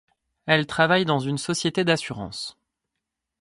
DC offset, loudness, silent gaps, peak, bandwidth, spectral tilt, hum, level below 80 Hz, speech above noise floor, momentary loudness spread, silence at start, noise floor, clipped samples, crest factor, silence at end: under 0.1%; -23 LUFS; none; -2 dBFS; 11.5 kHz; -4.5 dB/octave; none; -60 dBFS; 60 dB; 14 LU; 0.45 s; -83 dBFS; under 0.1%; 22 dB; 0.9 s